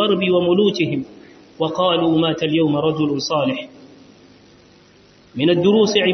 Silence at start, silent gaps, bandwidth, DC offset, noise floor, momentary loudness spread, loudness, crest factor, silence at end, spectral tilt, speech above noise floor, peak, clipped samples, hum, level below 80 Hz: 0 s; none; 6.4 kHz; under 0.1%; -50 dBFS; 12 LU; -18 LUFS; 16 dB; 0 s; -5.5 dB/octave; 33 dB; -2 dBFS; under 0.1%; none; -58 dBFS